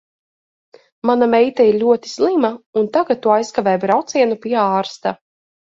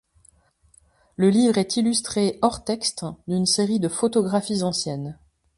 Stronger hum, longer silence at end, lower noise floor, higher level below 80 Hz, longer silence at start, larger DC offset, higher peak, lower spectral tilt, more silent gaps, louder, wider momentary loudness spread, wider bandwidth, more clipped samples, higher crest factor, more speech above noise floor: neither; first, 0.65 s vs 0.45 s; first, under -90 dBFS vs -59 dBFS; second, -62 dBFS vs -56 dBFS; second, 1.05 s vs 1.2 s; neither; first, 0 dBFS vs -4 dBFS; about the same, -5.5 dB/octave vs -4.5 dB/octave; first, 2.66-2.73 s vs none; first, -16 LUFS vs -22 LUFS; about the same, 9 LU vs 10 LU; second, 7.8 kHz vs 11.5 kHz; neither; about the same, 16 dB vs 18 dB; first, over 74 dB vs 37 dB